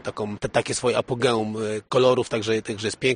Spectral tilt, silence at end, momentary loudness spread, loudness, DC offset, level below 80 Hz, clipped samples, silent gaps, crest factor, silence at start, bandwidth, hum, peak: -4.5 dB/octave; 0 s; 9 LU; -23 LUFS; under 0.1%; -54 dBFS; under 0.1%; none; 20 dB; 0.05 s; 10 kHz; none; -4 dBFS